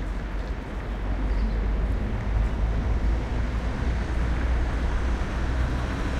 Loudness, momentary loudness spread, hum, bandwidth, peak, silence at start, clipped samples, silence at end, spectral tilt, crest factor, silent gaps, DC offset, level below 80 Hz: -28 LUFS; 6 LU; none; 8.4 kHz; -14 dBFS; 0 s; under 0.1%; 0 s; -7 dB/octave; 12 dB; none; under 0.1%; -26 dBFS